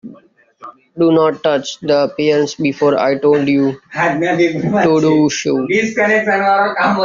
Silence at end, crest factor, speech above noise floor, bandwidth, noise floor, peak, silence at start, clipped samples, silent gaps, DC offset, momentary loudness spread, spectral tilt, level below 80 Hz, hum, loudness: 0 s; 14 dB; 33 dB; 7.6 kHz; -46 dBFS; 0 dBFS; 0.05 s; under 0.1%; none; under 0.1%; 5 LU; -4.5 dB/octave; -56 dBFS; none; -14 LUFS